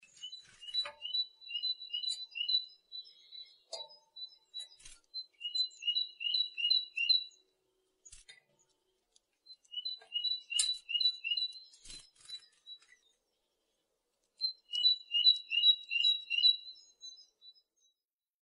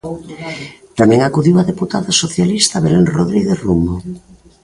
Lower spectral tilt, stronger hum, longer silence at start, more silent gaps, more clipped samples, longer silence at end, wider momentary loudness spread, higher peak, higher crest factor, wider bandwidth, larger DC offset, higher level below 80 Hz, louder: second, 4.5 dB/octave vs -5 dB/octave; neither; first, 0.2 s vs 0.05 s; neither; neither; first, 0.95 s vs 0.45 s; first, 24 LU vs 15 LU; second, -14 dBFS vs 0 dBFS; first, 24 dB vs 14 dB; about the same, 11 kHz vs 11.5 kHz; neither; second, -74 dBFS vs -38 dBFS; second, -31 LUFS vs -13 LUFS